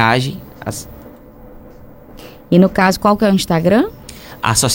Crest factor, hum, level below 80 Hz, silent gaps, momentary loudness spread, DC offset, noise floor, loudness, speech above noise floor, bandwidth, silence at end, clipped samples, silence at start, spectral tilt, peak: 16 dB; none; -40 dBFS; none; 17 LU; under 0.1%; -38 dBFS; -15 LUFS; 25 dB; 17 kHz; 0 s; under 0.1%; 0 s; -4.5 dB/octave; 0 dBFS